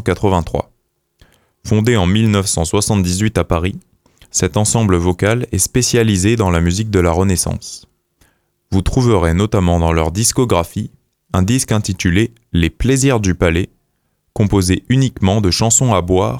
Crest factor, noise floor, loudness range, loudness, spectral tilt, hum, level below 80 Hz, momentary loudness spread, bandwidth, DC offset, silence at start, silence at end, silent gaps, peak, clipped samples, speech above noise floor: 14 dB; -65 dBFS; 2 LU; -15 LUFS; -5 dB/octave; none; -30 dBFS; 8 LU; 16.5 kHz; under 0.1%; 0 s; 0 s; none; 0 dBFS; under 0.1%; 51 dB